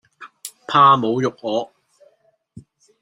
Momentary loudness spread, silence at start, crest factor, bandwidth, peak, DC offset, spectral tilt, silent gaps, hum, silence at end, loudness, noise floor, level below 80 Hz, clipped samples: 23 LU; 0.2 s; 20 dB; 15 kHz; -2 dBFS; under 0.1%; -5.5 dB/octave; none; none; 0.4 s; -17 LUFS; -59 dBFS; -66 dBFS; under 0.1%